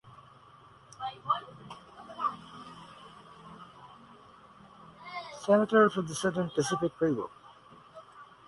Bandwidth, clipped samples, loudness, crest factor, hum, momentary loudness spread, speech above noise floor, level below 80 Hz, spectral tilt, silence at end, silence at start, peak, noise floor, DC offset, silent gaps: 11.5 kHz; under 0.1%; -30 LUFS; 24 dB; none; 27 LU; 28 dB; -70 dBFS; -5 dB/octave; 0.25 s; 0.05 s; -10 dBFS; -56 dBFS; under 0.1%; none